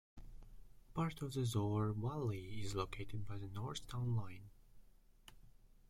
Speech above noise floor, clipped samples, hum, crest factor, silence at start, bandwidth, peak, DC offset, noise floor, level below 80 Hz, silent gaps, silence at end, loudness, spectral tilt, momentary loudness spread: 23 dB; under 0.1%; none; 18 dB; 0.15 s; 15.5 kHz; -24 dBFS; under 0.1%; -64 dBFS; -58 dBFS; none; 0.15 s; -42 LUFS; -6.5 dB/octave; 19 LU